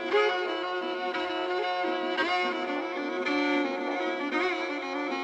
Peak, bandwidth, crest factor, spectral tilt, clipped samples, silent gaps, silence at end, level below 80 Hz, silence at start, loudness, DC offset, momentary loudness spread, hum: -14 dBFS; 9 kHz; 16 dB; -3 dB/octave; under 0.1%; none; 0 s; -74 dBFS; 0 s; -29 LUFS; under 0.1%; 5 LU; none